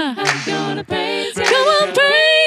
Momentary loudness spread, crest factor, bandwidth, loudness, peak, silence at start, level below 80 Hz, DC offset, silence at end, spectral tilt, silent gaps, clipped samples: 9 LU; 14 dB; 14.5 kHz; -15 LUFS; 0 dBFS; 0 s; -58 dBFS; under 0.1%; 0 s; -2.5 dB/octave; none; under 0.1%